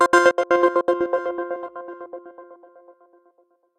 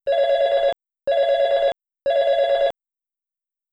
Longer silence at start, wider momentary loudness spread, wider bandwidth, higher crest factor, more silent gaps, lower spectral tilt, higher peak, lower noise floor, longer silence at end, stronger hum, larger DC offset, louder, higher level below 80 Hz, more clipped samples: about the same, 0 s vs 0.05 s; first, 21 LU vs 6 LU; first, 12 kHz vs 7.6 kHz; first, 20 dB vs 10 dB; neither; about the same, -3 dB/octave vs -2.5 dB/octave; first, -2 dBFS vs -10 dBFS; second, -62 dBFS vs -87 dBFS; first, 1.25 s vs 1 s; neither; neither; about the same, -20 LUFS vs -20 LUFS; second, -64 dBFS vs -58 dBFS; neither